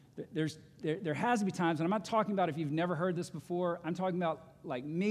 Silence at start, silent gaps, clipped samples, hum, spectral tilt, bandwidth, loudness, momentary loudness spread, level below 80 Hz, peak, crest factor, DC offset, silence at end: 0.15 s; none; under 0.1%; none; -6.5 dB/octave; 13 kHz; -35 LUFS; 9 LU; -74 dBFS; -18 dBFS; 16 dB; under 0.1%; 0 s